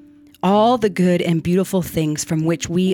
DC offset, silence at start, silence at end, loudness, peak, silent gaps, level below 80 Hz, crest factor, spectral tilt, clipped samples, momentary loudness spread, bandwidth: under 0.1%; 0.45 s; 0 s; -18 LUFS; -4 dBFS; none; -50 dBFS; 14 dB; -6 dB/octave; under 0.1%; 6 LU; 17.5 kHz